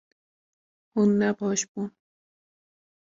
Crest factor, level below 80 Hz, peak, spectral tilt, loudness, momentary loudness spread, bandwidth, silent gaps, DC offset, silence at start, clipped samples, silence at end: 16 dB; -70 dBFS; -12 dBFS; -5 dB/octave; -26 LUFS; 13 LU; 7.8 kHz; 1.68-1.75 s; under 0.1%; 0.95 s; under 0.1%; 1.15 s